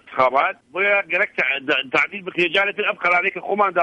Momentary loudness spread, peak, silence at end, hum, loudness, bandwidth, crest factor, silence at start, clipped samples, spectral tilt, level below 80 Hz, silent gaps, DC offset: 4 LU; -4 dBFS; 0 s; none; -19 LUFS; 9.4 kHz; 16 dB; 0.1 s; under 0.1%; -4.5 dB/octave; -64 dBFS; none; under 0.1%